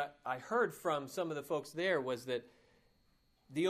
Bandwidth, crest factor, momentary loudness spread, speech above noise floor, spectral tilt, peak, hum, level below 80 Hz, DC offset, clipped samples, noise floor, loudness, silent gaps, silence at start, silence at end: 15.5 kHz; 18 dB; 8 LU; 35 dB; -5 dB/octave; -20 dBFS; none; -78 dBFS; under 0.1%; under 0.1%; -73 dBFS; -38 LUFS; none; 0 s; 0 s